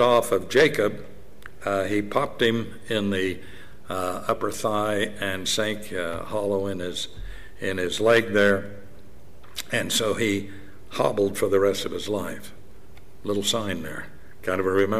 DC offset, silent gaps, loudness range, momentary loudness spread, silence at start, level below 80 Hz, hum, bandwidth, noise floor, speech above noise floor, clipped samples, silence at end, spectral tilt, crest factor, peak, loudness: 2%; none; 3 LU; 18 LU; 0 s; -52 dBFS; none; 16 kHz; -50 dBFS; 25 dB; under 0.1%; 0 s; -4 dB/octave; 18 dB; -8 dBFS; -25 LUFS